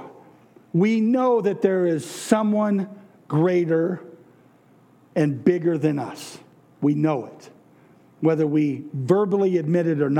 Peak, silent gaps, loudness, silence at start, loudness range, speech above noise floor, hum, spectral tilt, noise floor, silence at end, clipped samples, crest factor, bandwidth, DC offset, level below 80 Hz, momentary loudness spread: -4 dBFS; none; -22 LUFS; 0 s; 4 LU; 34 dB; none; -7.5 dB/octave; -55 dBFS; 0 s; under 0.1%; 18 dB; 15 kHz; under 0.1%; -80 dBFS; 10 LU